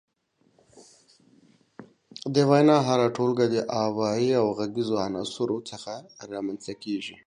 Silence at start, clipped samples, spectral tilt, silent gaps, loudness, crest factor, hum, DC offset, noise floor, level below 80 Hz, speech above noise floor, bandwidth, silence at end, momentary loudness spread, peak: 0.8 s; under 0.1%; -6 dB/octave; none; -25 LUFS; 20 dB; none; under 0.1%; -68 dBFS; -68 dBFS; 43 dB; 10.5 kHz; 0.1 s; 18 LU; -6 dBFS